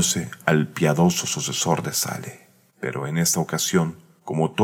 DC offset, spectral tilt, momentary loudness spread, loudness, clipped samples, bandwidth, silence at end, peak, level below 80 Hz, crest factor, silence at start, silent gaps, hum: under 0.1%; -4 dB/octave; 11 LU; -22 LUFS; under 0.1%; 17 kHz; 0 s; -2 dBFS; -60 dBFS; 20 dB; 0 s; none; none